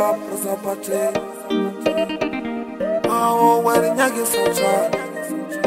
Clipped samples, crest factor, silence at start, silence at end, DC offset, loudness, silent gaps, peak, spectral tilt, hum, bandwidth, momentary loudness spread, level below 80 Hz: under 0.1%; 18 dB; 0 s; 0 s; under 0.1%; -20 LUFS; none; -2 dBFS; -4 dB/octave; none; 16 kHz; 11 LU; -56 dBFS